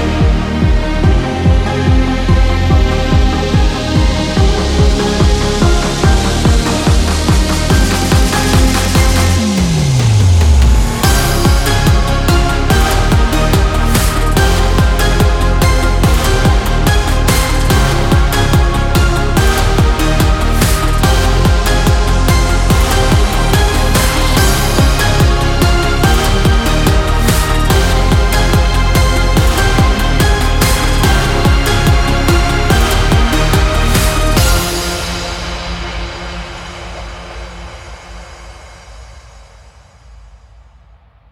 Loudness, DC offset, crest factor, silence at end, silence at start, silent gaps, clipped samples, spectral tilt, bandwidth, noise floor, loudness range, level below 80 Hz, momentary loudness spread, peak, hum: -12 LUFS; under 0.1%; 10 dB; 1.15 s; 0 s; none; under 0.1%; -5 dB/octave; 17 kHz; -44 dBFS; 3 LU; -14 dBFS; 2 LU; 0 dBFS; none